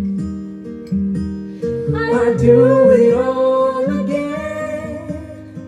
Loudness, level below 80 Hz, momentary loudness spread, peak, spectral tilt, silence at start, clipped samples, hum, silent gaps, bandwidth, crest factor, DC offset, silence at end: -16 LUFS; -44 dBFS; 18 LU; 0 dBFS; -8.5 dB/octave; 0 s; under 0.1%; none; none; 10 kHz; 16 dB; under 0.1%; 0 s